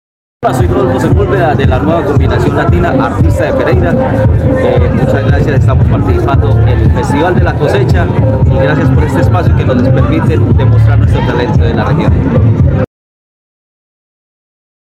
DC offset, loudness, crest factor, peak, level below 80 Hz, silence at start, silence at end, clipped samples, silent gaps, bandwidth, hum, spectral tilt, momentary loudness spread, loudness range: under 0.1%; -9 LUFS; 8 dB; 0 dBFS; -18 dBFS; 0.4 s; 2.1 s; under 0.1%; none; 9.6 kHz; none; -8.5 dB/octave; 2 LU; 2 LU